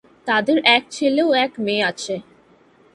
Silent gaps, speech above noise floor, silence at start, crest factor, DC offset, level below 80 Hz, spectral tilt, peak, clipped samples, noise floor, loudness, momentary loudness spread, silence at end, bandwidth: none; 35 dB; 0.25 s; 20 dB; under 0.1%; -68 dBFS; -3.5 dB/octave; 0 dBFS; under 0.1%; -53 dBFS; -18 LUFS; 13 LU; 0.7 s; 11.5 kHz